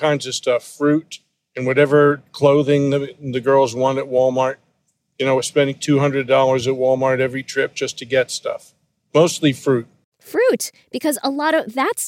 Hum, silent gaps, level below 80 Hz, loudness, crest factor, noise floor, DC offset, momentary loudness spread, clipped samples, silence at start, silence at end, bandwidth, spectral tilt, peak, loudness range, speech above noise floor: none; 10.04-10.12 s; -64 dBFS; -18 LUFS; 16 dB; -68 dBFS; under 0.1%; 10 LU; under 0.1%; 0 s; 0 s; 17 kHz; -5 dB/octave; -2 dBFS; 3 LU; 50 dB